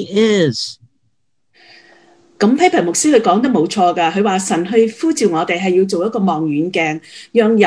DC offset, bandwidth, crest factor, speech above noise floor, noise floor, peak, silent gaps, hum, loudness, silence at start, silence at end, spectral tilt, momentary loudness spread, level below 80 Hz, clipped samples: under 0.1%; 11 kHz; 16 dB; 54 dB; -68 dBFS; 0 dBFS; none; none; -15 LUFS; 0 s; 0 s; -4.5 dB/octave; 6 LU; -60 dBFS; under 0.1%